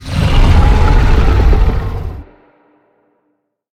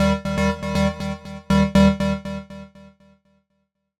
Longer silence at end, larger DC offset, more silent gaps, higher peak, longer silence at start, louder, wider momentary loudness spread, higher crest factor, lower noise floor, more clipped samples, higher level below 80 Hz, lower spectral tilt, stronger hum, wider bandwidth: first, 1.5 s vs 1.35 s; neither; neither; first, 0 dBFS vs -6 dBFS; about the same, 0 s vs 0 s; first, -13 LUFS vs -20 LUFS; second, 14 LU vs 17 LU; second, 10 dB vs 16 dB; second, -65 dBFS vs -72 dBFS; neither; first, -12 dBFS vs -34 dBFS; about the same, -7 dB/octave vs -6.5 dB/octave; neither; second, 9.8 kHz vs 12 kHz